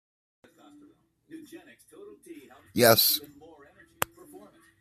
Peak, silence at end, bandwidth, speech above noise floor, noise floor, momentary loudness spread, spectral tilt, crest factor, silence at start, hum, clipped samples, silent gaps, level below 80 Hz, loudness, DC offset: 0 dBFS; 1.55 s; 15 kHz; 33 dB; -60 dBFS; 30 LU; -3 dB/octave; 30 dB; 1.35 s; none; under 0.1%; none; -68 dBFS; -24 LUFS; under 0.1%